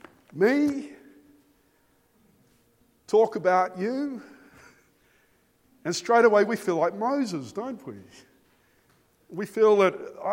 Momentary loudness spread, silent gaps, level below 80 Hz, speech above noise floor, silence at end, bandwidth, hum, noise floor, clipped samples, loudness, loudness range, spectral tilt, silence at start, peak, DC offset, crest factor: 21 LU; none; -74 dBFS; 41 dB; 0 s; 16.5 kHz; none; -65 dBFS; under 0.1%; -24 LUFS; 3 LU; -5 dB/octave; 0.35 s; -6 dBFS; under 0.1%; 20 dB